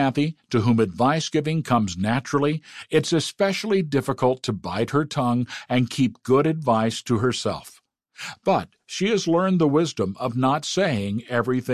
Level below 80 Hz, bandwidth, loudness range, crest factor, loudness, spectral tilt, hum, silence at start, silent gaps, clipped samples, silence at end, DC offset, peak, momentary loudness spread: -54 dBFS; 14 kHz; 1 LU; 16 dB; -23 LUFS; -5.5 dB/octave; none; 0 s; none; under 0.1%; 0 s; 0.1%; -6 dBFS; 6 LU